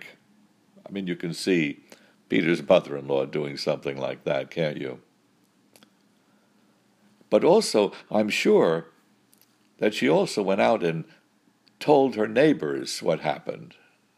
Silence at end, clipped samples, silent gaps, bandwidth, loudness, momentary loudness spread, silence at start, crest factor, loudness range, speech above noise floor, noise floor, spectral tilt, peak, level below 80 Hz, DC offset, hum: 0.5 s; under 0.1%; none; 15.5 kHz; -24 LUFS; 14 LU; 0 s; 20 dB; 8 LU; 40 dB; -64 dBFS; -5 dB/octave; -4 dBFS; -72 dBFS; under 0.1%; none